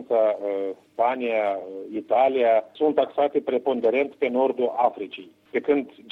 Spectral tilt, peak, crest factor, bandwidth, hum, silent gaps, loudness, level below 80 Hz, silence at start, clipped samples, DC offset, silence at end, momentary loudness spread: -7 dB/octave; -6 dBFS; 16 dB; 4.9 kHz; none; none; -24 LUFS; -74 dBFS; 0 s; under 0.1%; under 0.1%; 0.2 s; 11 LU